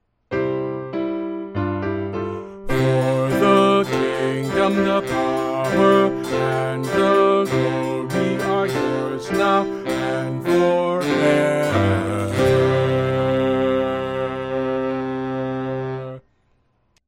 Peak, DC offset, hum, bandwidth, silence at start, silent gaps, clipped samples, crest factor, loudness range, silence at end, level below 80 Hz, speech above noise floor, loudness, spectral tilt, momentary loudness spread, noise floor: -2 dBFS; under 0.1%; none; 16.5 kHz; 0.3 s; none; under 0.1%; 16 dB; 4 LU; 0.9 s; -46 dBFS; 45 dB; -20 LUFS; -6.5 dB/octave; 9 LU; -63 dBFS